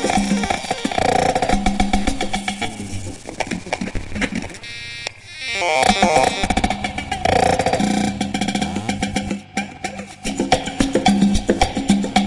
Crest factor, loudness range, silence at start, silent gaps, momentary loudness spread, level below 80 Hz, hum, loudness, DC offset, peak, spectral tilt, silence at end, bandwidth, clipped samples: 18 dB; 6 LU; 0 s; none; 13 LU; -32 dBFS; none; -20 LUFS; under 0.1%; -2 dBFS; -4.5 dB/octave; 0 s; 11.5 kHz; under 0.1%